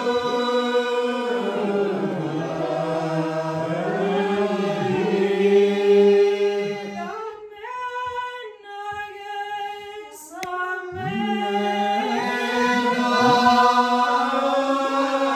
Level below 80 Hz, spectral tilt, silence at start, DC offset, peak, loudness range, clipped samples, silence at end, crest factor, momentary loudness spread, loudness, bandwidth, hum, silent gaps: -66 dBFS; -5.5 dB/octave; 0 s; under 0.1%; -4 dBFS; 11 LU; under 0.1%; 0 s; 16 dB; 16 LU; -21 LUFS; 13.5 kHz; none; none